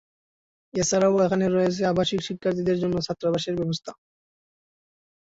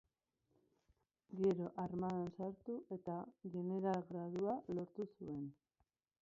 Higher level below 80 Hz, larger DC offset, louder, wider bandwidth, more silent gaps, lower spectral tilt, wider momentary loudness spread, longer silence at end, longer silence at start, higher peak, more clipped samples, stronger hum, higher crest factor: first, -56 dBFS vs -76 dBFS; neither; first, -24 LUFS vs -44 LUFS; about the same, 8 kHz vs 7.4 kHz; neither; second, -5 dB/octave vs -8.5 dB/octave; about the same, 8 LU vs 10 LU; first, 1.45 s vs 0.7 s; second, 0.75 s vs 1.3 s; first, -10 dBFS vs -26 dBFS; neither; neither; about the same, 16 dB vs 18 dB